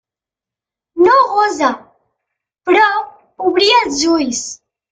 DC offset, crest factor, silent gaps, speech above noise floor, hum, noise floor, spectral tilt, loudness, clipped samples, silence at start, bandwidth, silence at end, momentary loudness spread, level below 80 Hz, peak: under 0.1%; 14 dB; none; 74 dB; none; -88 dBFS; -1.5 dB/octave; -13 LUFS; under 0.1%; 0.95 s; 9.4 kHz; 0.35 s; 18 LU; -54 dBFS; 0 dBFS